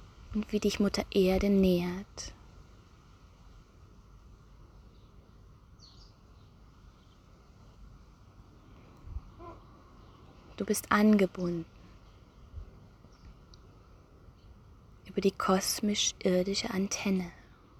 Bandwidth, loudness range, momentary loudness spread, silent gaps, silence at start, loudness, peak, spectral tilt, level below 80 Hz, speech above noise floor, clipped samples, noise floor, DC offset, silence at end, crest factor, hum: 17 kHz; 22 LU; 24 LU; none; 0 s; -30 LUFS; -10 dBFS; -4.5 dB/octave; -52 dBFS; 29 dB; under 0.1%; -58 dBFS; under 0.1%; 0.4 s; 24 dB; none